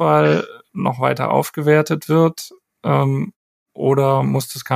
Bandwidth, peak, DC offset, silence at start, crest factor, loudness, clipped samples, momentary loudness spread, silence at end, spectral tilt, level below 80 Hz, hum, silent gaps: 15.5 kHz; 0 dBFS; under 0.1%; 0 s; 16 dB; -18 LUFS; under 0.1%; 11 LU; 0 s; -6.5 dB/octave; -62 dBFS; none; 3.36-3.66 s